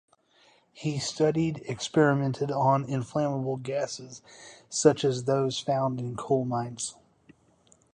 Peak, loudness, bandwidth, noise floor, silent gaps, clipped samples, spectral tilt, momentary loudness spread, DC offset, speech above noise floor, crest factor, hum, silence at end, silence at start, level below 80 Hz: -6 dBFS; -28 LUFS; 11 kHz; -63 dBFS; none; under 0.1%; -5.5 dB/octave; 12 LU; under 0.1%; 35 dB; 22 dB; none; 1.05 s; 0.75 s; -64 dBFS